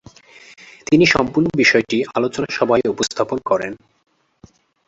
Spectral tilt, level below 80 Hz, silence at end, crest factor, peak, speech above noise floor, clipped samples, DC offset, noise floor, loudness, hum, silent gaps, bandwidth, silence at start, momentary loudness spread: -4.5 dB/octave; -50 dBFS; 1.15 s; 18 dB; -2 dBFS; 33 dB; under 0.1%; under 0.1%; -50 dBFS; -17 LUFS; none; none; 8 kHz; 0.9 s; 9 LU